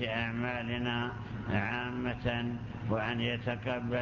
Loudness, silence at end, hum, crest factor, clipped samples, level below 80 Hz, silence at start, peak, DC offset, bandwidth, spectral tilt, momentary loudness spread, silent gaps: -34 LUFS; 0 s; none; 16 dB; under 0.1%; -52 dBFS; 0 s; -18 dBFS; under 0.1%; 7 kHz; -7.5 dB/octave; 4 LU; none